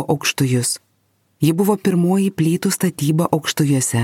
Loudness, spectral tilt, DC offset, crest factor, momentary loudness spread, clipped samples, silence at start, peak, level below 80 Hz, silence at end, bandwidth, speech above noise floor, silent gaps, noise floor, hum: -18 LUFS; -5 dB/octave; under 0.1%; 16 dB; 3 LU; under 0.1%; 0 s; -2 dBFS; -58 dBFS; 0 s; 17 kHz; 46 dB; none; -63 dBFS; none